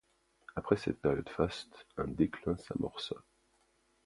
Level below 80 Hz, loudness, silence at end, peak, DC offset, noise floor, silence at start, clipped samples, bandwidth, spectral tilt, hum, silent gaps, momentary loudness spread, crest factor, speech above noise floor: -56 dBFS; -36 LUFS; 0.85 s; -12 dBFS; under 0.1%; -73 dBFS; 0.55 s; under 0.1%; 11.5 kHz; -7 dB/octave; none; none; 12 LU; 24 dB; 38 dB